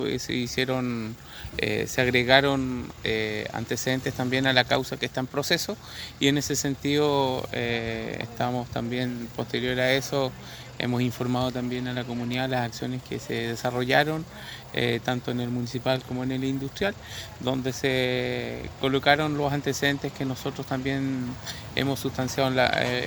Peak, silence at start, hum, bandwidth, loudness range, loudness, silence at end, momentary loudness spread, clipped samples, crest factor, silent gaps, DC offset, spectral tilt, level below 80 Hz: -2 dBFS; 0 s; none; over 20 kHz; 4 LU; -26 LUFS; 0 s; 10 LU; under 0.1%; 24 dB; none; under 0.1%; -4.5 dB/octave; -50 dBFS